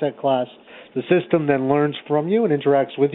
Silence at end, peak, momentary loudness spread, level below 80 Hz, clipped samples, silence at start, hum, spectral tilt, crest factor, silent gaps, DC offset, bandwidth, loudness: 0 s; -4 dBFS; 8 LU; -66 dBFS; under 0.1%; 0 s; none; -11.5 dB/octave; 16 dB; none; under 0.1%; 4.1 kHz; -20 LUFS